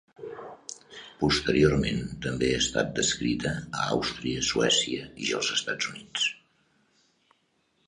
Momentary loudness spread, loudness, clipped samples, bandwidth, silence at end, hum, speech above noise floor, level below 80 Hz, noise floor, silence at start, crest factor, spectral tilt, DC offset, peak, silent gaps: 19 LU; -27 LUFS; under 0.1%; 11 kHz; 1.5 s; none; 44 dB; -48 dBFS; -71 dBFS; 0.2 s; 22 dB; -3.5 dB/octave; under 0.1%; -8 dBFS; none